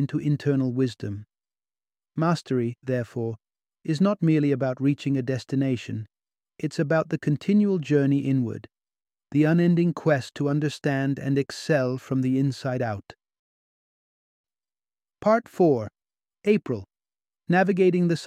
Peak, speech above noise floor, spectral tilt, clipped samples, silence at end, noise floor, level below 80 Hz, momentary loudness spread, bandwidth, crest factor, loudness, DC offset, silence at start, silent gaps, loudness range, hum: -8 dBFS; over 67 dB; -7.5 dB/octave; under 0.1%; 0 s; under -90 dBFS; -66 dBFS; 12 LU; 10.5 kHz; 18 dB; -24 LUFS; under 0.1%; 0 s; 13.39-14.44 s; 5 LU; none